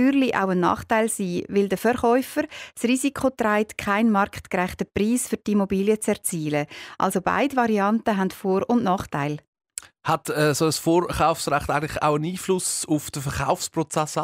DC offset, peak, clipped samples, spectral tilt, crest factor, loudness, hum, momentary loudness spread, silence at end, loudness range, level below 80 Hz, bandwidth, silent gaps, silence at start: under 0.1%; -6 dBFS; under 0.1%; -5 dB/octave; 16 dB; -23 LUFS; none; 7 LU; 0 s; 1 LU; -50 dBFS; 16 kHz; 9.47-9.53 s; 0 s